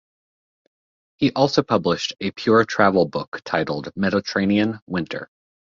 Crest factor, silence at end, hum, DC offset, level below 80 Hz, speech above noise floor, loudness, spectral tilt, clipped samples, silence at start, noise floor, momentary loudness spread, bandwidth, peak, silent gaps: 20 dB; 0.5 s; none; under 0.1%; -54 dBFS; over 70 dB; -21 LUFS; -5.5 dB/octave; under 0.1%; 1.2 s; under -90 dBFS; 9 LU; 7.4 kHz; -2 dBFS; 3.28-3.32 s, 4.82-4.87 s